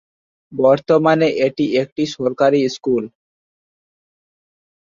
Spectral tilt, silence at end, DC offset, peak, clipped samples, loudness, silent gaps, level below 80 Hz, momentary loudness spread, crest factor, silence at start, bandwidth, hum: -6 dB/octave; 1.75 s; under 0.1%; -2 dBFS; under 0.1%; -17 LUFS; 1.92-1.96 s; -62 dBFS; 8 LU; 16 dB; 0.5 s; 7.6 kHz; none